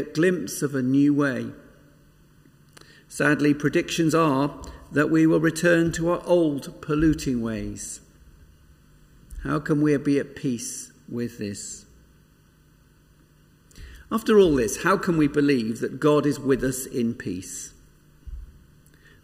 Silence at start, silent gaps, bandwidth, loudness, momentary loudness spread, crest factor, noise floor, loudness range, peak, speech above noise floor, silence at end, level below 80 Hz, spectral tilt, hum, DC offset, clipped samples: 0 s; none; 16 kHz; -23 LUFS; 16 LU; 18 dB; -57 dBFS; 7 LU; -6 dBFS; 34 dB; 0.75 s; -46 dBFS; -5.5 dB/octave; none; under 0.1%; under 0.1%